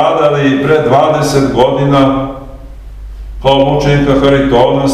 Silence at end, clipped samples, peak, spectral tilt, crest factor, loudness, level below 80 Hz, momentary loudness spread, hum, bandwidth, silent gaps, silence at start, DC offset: 0 s; 0.3%; 0 dBFS; -6.5 dB/octave; 10 dB; -10 LUFS; -28 dBFS; 8 LU; none; 13.5 kHz; none; 0 s; 0.3%